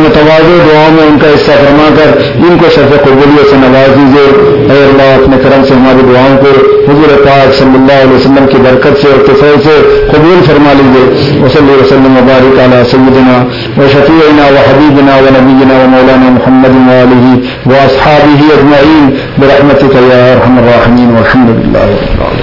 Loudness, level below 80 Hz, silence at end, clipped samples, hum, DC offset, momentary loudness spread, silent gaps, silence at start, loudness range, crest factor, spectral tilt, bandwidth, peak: -3 LUFS; -24 dBFS; 0 s; 20%; none; 2%; 3 LU; none; 0 s; 1 LU; 2 dB; -8 dB/octave; 6 kHz; 0 dBFS